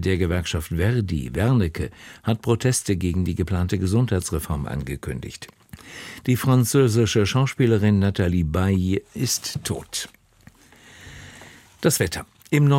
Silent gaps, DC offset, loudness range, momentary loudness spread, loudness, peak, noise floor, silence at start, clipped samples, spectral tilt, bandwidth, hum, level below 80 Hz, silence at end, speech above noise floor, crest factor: none; under 0.1%; 7 LU; 17 LU; -22 LUFS; -6 dBFS; -52 dBFS; 0 s; under 0.1%; -5.5 dB/octave; 16.5 kHz; none; -40 dBFS; 0 s; 31 dB; 18 dB